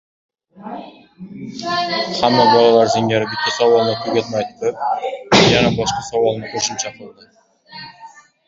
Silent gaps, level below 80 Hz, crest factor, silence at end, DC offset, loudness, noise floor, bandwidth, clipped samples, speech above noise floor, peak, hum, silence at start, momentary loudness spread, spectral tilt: none; -48 dBFS; 18 dB; 0.4 s; under 0.1%; -16 LUFS; -42 dBFS; 7.8 kHz; under 0.1%; 25 dB; 0 dBFS; none; 0.6 s; 22 LU; -4 dB/octave